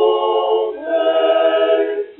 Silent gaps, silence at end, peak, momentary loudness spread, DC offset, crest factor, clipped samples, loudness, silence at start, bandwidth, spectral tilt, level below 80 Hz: none; 0.05 s; -4 dBFS; 4 LU; under 0.1%; 12 dB; under 0.1%; -16 LUFS; 0 s; 4.1 kHz; 1.5 dB/octave; -64 dBFS